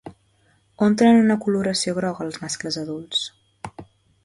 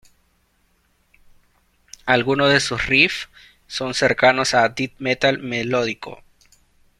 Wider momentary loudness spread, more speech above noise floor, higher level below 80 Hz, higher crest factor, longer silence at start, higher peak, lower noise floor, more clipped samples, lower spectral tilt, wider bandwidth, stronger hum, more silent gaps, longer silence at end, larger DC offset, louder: first, 23 LU vs 15 LU; about the same, 41 dB vs 44 dB; second, -60 dBFS vs -50 dBFS; second, 16 dB vs 22 dB; second, 0.05 s vs 2.05 s; second, -6 dBFS vs 0 dBFS; about the same, -61 dBFS vs -63 dBFS; neither; about the same, -4.5 dB/octave vs -3.5 dB/octave; second, 11.5 kHz vs 14 kHz; neither; neither; second, 0.4 s vs 0.85 s; neither; second, -21 LUFS vs -18 LUFS